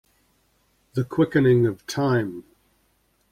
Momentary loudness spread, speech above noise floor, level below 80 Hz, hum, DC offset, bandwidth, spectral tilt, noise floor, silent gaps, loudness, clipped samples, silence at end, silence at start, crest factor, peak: 14 LU; 45 dB; -56 dBFS; none; under 0.1%; 15 kHz; -7 dB/octave; -66 dBFS; none; -22 LUFS; under 0.1%; 0.9 s; 0.95 s; 18 dB; -8 dBFS